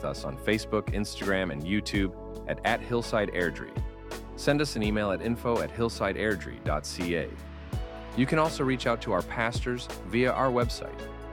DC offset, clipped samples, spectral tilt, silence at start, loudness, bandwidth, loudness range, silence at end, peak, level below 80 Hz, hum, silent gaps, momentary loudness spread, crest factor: under 0.1%; under 0.1%; -5.5 dB/octave; 0 s; -29 LUFS; 18.5 kHz; 2 LU; 0 s; -8 dBFS; -42 dBFS; none; none; 11 LU; 20 dB